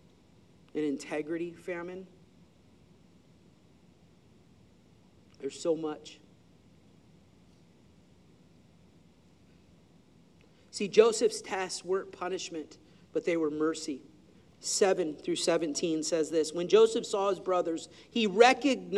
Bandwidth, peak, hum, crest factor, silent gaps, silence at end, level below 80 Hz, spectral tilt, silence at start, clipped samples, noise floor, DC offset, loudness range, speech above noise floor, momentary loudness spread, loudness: 12.5 kHz; -8 dBFS; none; 26 dB; none; 0 s; -74 dBFS; -3.5 dB/octave; 0.75 s; under 0.1%; -61 dBFS; under 0.1%; 15 LU; 32 dB; 17 LU; -30 LUFS